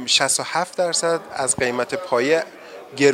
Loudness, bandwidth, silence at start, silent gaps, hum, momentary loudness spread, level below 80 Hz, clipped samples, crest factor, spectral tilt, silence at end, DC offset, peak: -20 LUFS; 16 kHz; 0 s; none; none; 10 LU; -60 dBFS; under 0.1%; 20 dB; -2 dB/octave; 0 s; under 0.1%; 0 dBFS